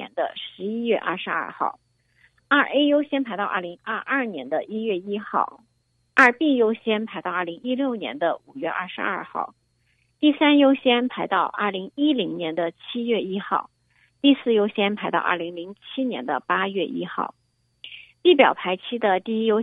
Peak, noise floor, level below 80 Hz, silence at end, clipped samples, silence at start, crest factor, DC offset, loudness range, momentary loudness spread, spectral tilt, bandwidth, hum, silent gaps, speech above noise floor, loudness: 0 dBFS; -68 dBFS; -72 dBFS; 0 s; under 0.1%; 0 s; 22 dB; under 0.1%; 4 LU; 12 LU; -6 dB/octave; 8 kHz; none; none; 45 dB; -23 LUFS